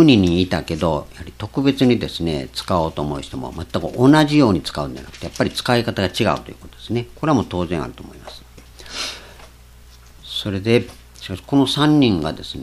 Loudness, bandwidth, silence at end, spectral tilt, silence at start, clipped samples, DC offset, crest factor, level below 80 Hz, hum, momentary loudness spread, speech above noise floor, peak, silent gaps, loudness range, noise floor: -19 LUFS; 14 kHz; 0 s; -6 dB/octave; 0 s; under 0.1%; under 0.1%; 20 dB; -42 dBFS; none; 18 LU; 25 dB; 0 dBFS; none; 7 LU; -44 dBFS